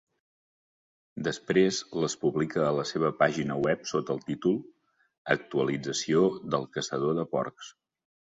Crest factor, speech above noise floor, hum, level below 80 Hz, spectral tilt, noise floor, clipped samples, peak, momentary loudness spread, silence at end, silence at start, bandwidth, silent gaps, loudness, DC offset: 20 dB; over 62 dB; none; -66 dBFS; -5 dB/octave; under -90 dBFS; under 0.1%; -8 dBFS; 8 LU; 0.7 s; 1.15 s; 7.8 kHz; 5.18-5.25 s; -29 LUFS; under 0.1%